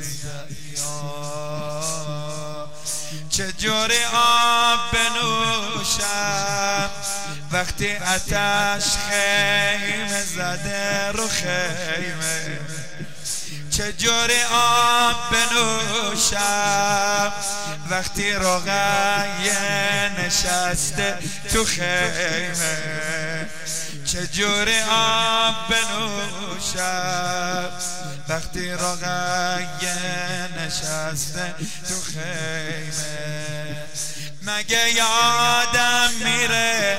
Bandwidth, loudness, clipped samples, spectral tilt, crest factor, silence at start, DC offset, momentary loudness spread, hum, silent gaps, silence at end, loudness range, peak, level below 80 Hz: 16 kHz; -21 LUFS; under 0.1%; -1.5 dB/octave; 14 dB; 0 s; 3%; 12 LU; none; none; 0 s; 7 LU; -8 dBFS; -42 dBFS